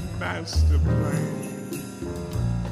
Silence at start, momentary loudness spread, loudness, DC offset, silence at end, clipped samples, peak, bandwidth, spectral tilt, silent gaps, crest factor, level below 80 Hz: 0 s; 11 LU; -26 LUFS; under 0.1%; 0 s; under 0.1%; -12 dBFS; 15 kHz; -6.5 dB/octave; none; 12 dB; -30 dBFS